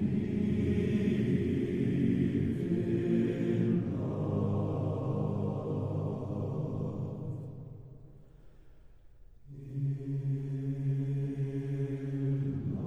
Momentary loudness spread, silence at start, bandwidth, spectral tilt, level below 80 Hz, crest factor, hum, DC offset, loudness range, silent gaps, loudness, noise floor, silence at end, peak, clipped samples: 9 LU; 0 s; 7 kHz; -10 dB/octave; -56 dBFS; 14 dB; none; under 0.1%; 10 LU; none; -33 LUFS; -54 dBFS; 0 s; -18 dBFS; under 0.1%